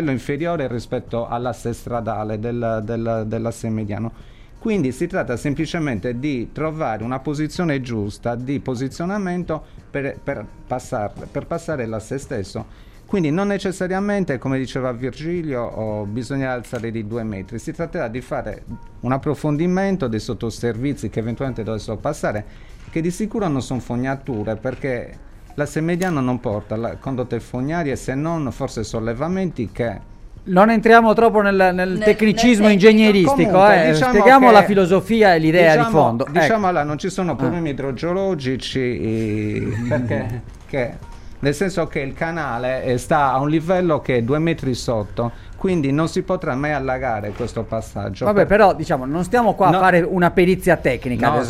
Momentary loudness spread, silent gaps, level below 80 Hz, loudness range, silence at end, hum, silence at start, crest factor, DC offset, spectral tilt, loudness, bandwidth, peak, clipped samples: 14 LU; none; -40 dBFS; 12 LU; 0 s; none; 0 s; 18 dB; under 0.1%; -6.5 dB/octave; -19 LUFS; 15 kHz; 0 dBFS; under 0.1%